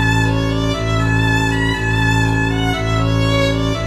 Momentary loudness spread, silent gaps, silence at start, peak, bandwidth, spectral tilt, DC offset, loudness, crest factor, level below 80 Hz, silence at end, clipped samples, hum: 3 LU; none; 0 s; -2 dBFS; 13 kHz; -5.5 dB/octave; under 0.1%; -16 LUFS; 14 dB; -26 dBFS; 0 s; under 0.1%; none